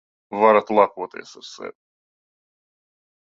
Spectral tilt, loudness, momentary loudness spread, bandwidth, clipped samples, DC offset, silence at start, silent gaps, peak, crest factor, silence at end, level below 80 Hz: -5.5 dB/octave; -18 LUFS; 21 LU; 7.6 kHz; under 0.1%; under 0.1%; 0.3 s; none; 0 dBFS; 24 dB; 1.5 s; -70 dBFS